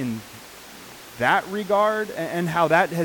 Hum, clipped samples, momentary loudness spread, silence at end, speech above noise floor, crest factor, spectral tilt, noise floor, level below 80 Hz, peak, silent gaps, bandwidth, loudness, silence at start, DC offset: none; under 0.1%; 21 LU; 0 s; 20 dB; 18 dB; -5 dB/octave; -42 dBFS; -60 dBFS; -6 dBFS; none; 19 kHz; -22 LUFS; 0 s; under 0.1%